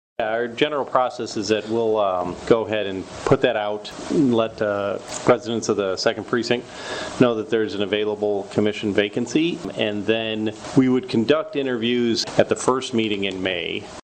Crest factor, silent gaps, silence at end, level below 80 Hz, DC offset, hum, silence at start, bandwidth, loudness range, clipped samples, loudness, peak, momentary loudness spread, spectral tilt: 20 dB; none; 0.05 s; -54 dBFS; under 0.1%; none; 0.2 s; 9.4 kHz; 1 LU; under 0.1%; -22 LUFS; -2 dBFS; 6 LU; -5 dB/octave